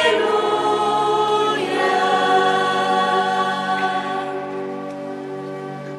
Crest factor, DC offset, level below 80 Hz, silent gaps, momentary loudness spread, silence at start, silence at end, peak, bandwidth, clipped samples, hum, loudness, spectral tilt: 16 dB; under 0.1%; -64 dBFS; none; 13 LU; 0 s; 0 s; -4 dBFS; 13 kHz; under 0.1%; none; -19 LUFS; -4 dB/octave